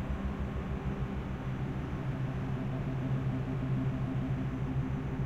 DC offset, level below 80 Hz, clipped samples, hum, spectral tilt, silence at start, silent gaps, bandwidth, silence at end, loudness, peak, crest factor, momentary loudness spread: under 0.1%; -42 dBFS; under 0.1%; none; -9 dB/octave; 0 s; none; 7.4 kHz; 0 s; -35 LUFS; -22 dBFS; 12 dB; 4 LU